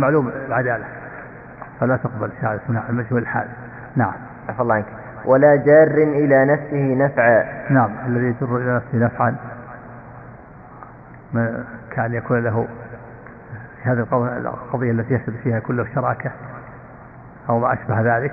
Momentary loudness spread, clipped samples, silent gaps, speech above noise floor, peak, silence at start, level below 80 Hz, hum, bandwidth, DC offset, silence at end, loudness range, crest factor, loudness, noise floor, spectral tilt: 22 LU; under 0.1%; none; 22 dB; -2 dBFS; 0 s; -52 dBFS; none; 2.8 kHz; under 0.1%; 0 s; 10 LU; 18 dB; -19 LUFS; -40 dBFS; -12.5 dB/octave